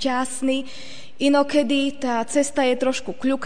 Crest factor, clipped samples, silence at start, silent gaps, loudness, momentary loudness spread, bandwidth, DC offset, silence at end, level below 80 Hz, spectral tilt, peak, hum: 14 dB; under 0.1%; 0 s; none; -22 LUFS; 8 LU; 10 kHz; 2%; 0 s; -58 dBFS; -3 dB/octave; -6 dBFS; none